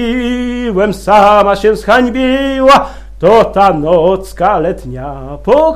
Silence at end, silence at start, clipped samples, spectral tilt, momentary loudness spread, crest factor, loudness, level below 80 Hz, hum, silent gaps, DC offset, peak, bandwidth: 0 s; 0 s; 0.6%; -6 dB/octave; 13 LU; 10 dB; -10 LUFS; -30 dBFS; none; none; under 0.1%; 0 dBFS; 15 kHz